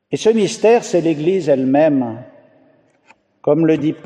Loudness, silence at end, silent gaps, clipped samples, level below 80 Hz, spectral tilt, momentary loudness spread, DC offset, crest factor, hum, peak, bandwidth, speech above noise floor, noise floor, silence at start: -15 LUFS; 0.1 s; none; under 0.1%; -66 dBFS; -6 dB/octave; 8 LU; under 0.1%; 14 dB; none; -2 dBFS; 10.5 kHz; 39 dB; -54 dBFS; 0.1 s